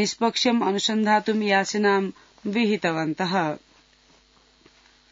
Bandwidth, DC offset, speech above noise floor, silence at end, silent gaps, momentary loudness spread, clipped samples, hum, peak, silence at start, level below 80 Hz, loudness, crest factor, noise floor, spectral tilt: 7.8 kHz; under 0.1%; 36 dB; 1.55 s; none; 8 LU; under 0.1%; none; -6 dBFS; 0 s; -68 dBFS; -23 LUFS; 18 dB; -58 dBFS; -4 dB/octave